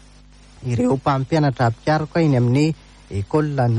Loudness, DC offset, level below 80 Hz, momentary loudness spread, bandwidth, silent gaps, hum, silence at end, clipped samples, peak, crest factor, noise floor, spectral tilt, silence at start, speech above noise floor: -19 LUFS; under 0.1%; -46 dBFS; 12 LU; 10 kHz; none; none; 0 s; under 0.1%; -6 dBFS; 14 dB; -46 dBFS; -7.5 dB/octave; 0.6 s; 28 dB